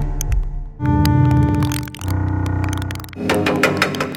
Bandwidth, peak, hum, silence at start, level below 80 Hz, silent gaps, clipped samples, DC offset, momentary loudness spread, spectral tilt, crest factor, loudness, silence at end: 17 kHz; 0 dBFS; none; 0 s; -26 dBFS; none; under 0.1%; under 0.1%; 10 LU; -6 dB/octave; 18 dB; -19 LUFS; 0 s